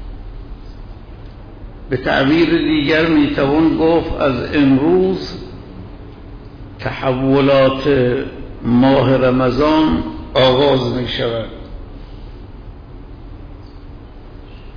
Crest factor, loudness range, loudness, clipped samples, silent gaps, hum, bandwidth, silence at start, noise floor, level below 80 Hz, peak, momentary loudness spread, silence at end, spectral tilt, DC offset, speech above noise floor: 12 dB; 5 LU; -15 LUFS; under 0.1%; none; none; 5.4 kHz; 0 s; -34 dBFS; -34 dBFS; -4 dBFS; 24 LU; 0 s; -8 dB/octave; under 0.1%; 21 dB